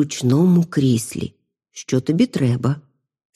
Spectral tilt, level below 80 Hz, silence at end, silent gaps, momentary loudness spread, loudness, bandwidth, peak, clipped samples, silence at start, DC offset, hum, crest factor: -6.5 dB/octave; -56 dBFS; 0.55 s; none; 15 LU; -19 LUFS; 14 kHz; -6 dBFS; under 0.1%; 0 s; under 0.1%; none; 14 dB